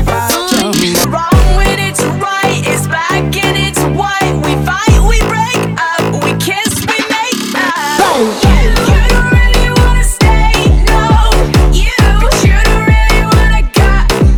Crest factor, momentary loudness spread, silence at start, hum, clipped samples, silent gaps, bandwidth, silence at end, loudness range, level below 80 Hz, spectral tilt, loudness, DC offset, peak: 8 dB; 4 LU; 0 s; none; under 0.1%; none; 18 kHz; 0 s; 2 LU; -12 dBFS; -4.5 dB/octave; -10 LUFS; under 0.1%; 0 dBFS